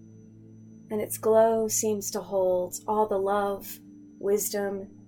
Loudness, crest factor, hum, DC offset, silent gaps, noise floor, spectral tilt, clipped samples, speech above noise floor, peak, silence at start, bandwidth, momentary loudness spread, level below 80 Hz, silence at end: -27 LUFS; 16 dB; none; under 0.1%; none; -49 dBFS; -4 dB/octave; under 0.1%; 23 dB; -10 dBFS; 0.05 s; 18 kHz; 13 LU; -62 dBFS; 0.05 s